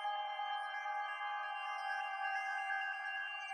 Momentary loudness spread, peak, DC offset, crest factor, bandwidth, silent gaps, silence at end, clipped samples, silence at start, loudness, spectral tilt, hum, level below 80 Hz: 3 LU; -28 dBFS; under 0.1%; 12 dB; 10 kHz; none; 0 s; under 0.1%; 0 s; -40 LUFS; 5 dB/octave; none; under -90 dBFS